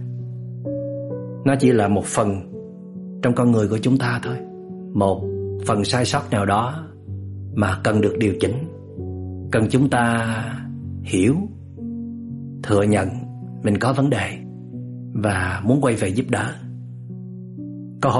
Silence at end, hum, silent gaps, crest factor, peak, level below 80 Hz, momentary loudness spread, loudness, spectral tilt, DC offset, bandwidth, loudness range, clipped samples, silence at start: 0 s; none; none; 18 dB; -4 dBFS; -52 dBFS; 16 LU; -21 LUFS; -6.5 dB/octave; under 0.1%; 11.5 kHz; 2 LU; under 0.1%; 0 s